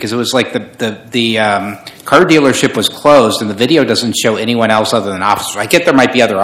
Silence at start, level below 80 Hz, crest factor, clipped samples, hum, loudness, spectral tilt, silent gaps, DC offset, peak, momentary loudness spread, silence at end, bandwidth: 0 s; -50 dBFS; 12 dB; 2%; none; -11 LUFS; -4 dB/octave; none; under 0.1%; 0 dBFS; 9 LU; 0 s; 17 kHz